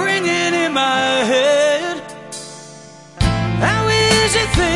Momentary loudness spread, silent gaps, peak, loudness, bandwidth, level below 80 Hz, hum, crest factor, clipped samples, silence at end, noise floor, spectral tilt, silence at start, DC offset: 17 LU; none; 0 dBFS; -15 LUFS; 11.5 kHz; -32 dBFS; none; 16 dB; under 0.1%; 0 s; -39 dBFS; -4 dB/octave; 0 s; 0.1%